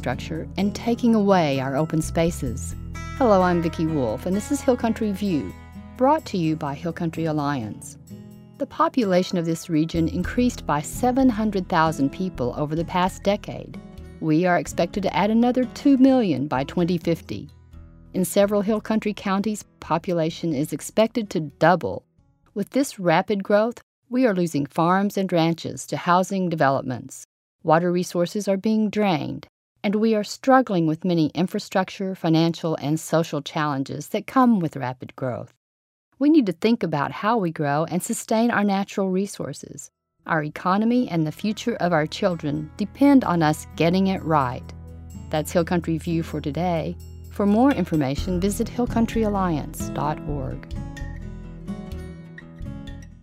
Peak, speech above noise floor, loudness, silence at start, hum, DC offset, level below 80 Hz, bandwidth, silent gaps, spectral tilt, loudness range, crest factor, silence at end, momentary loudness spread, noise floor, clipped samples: -2 dBFS; 38 dB; -23 LUFS; 0 s; none; under 0.1%; -44 dBFS; 16 kHz; 23.83-24.02 s, 27.25-27.59 s, 29.49-29.75 s, 35.57-36.12 s; -6 dB/octave; 3 LU; 20 dB; 0.1 s; 16 LU; -60 dBFS; under 0.1%